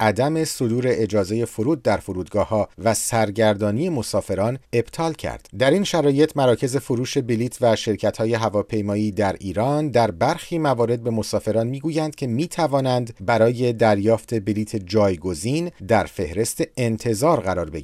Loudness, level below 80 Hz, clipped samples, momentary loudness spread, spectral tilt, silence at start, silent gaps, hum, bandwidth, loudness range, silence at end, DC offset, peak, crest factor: -21 LUFS; -50 dBFS; under 0.1%; 6 LU; -5.5 dB/octave; 0 s; none; none; 15.5 kHz; 2 LU; 0 s; under 0.1%; -4 dBFS; 16 dB